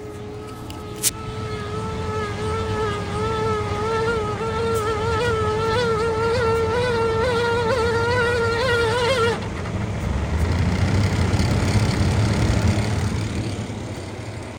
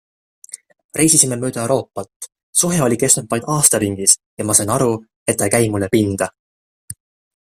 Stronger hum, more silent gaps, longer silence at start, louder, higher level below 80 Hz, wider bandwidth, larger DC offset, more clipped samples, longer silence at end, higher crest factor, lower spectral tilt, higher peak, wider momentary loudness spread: neither; second, none vs 0.84-0.89 s, 2.16-2.20 s, 2.43-2.53 s, 4.26-4.37 s, 5.16-5.26 s, 6.39-6.88 s; second, 0 s vs 0.55 s; second, -22 LUFS vs -15 LUFS; first, -34 dBFS vs -52 dBFS; first, 18 kHz vs 16 kHz; neither; neither; second, 0 s vs 0.55 s; about the same, 20 dB vs 18 dB; first, -5.5 dB/octave vs -3.5 dB/octave; about the same, -2 dBFS vs 0 dBFS; second, 10 LU vs 22 LU